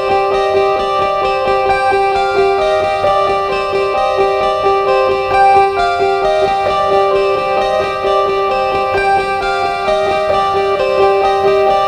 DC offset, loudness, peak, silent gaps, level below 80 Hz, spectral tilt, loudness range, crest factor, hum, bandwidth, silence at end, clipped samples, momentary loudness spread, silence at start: under 0.1%; -13 LUFS; 0 dBFS; none; -38 dBFS; -4.5 dB/octave; 2 LU; 12 dB; none; 9.8 kHz; 0 s; under 0.1%; 3 LU; 0 s